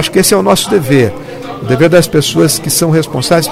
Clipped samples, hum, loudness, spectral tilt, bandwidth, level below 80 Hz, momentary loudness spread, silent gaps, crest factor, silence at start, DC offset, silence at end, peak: 0.4%; none; -10 LUFS; -4.5 dB/octave; 16.5 kHz; -38 dBFS; 8 LU; none; 10 dB; 0 s; under 0.1%; 0 s; 0 dBFS